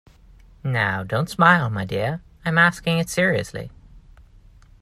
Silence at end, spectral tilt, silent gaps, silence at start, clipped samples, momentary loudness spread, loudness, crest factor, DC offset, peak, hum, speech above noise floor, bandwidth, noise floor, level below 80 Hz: 0.85 s; -5.5 dB/octave; none; 0.65 s; under 0.1%; 15 LU; -20 LUFS; 22 dB; under 0.1%; 0 dBFS; none; 28 dB; 14.5 kHz; -49 dBFS; -50 dBFS